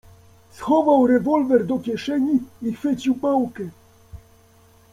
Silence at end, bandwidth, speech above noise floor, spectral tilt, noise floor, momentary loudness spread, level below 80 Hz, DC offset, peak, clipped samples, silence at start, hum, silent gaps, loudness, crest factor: 0.75 s; 13 kHz; 33 dB; -7 dB/octave; -53 dBFS; 13 LU; -56 dBFS; under 0.1%; -4 dBFS; under 0.1%; 0.55 s; none; none; -20 LUFS; 16 dB